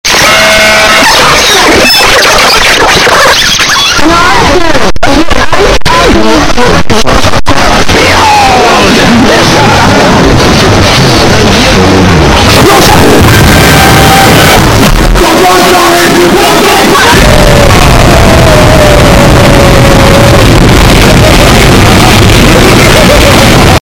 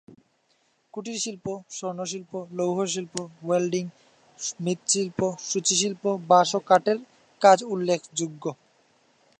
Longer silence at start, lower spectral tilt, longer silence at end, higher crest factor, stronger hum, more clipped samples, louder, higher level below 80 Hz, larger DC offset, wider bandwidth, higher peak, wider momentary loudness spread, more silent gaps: second, 0.05 s vs 0.95 s; about the same, -4 dB/octave vs -3.5 dB/octave; second, 0.05 s vs 0.85 s; second, 2 dB vs 22 dB; neither; first, 10% vs under 0.1%; first, -2 LUFS vs -25 LUFS; first, -12 dBFS vs -70 dBFS; neither; first, over 20 kHz vs 11 kHz; first, 0 dBFS vs -4 dBFS; second, 4 LU vs 15 LU; neither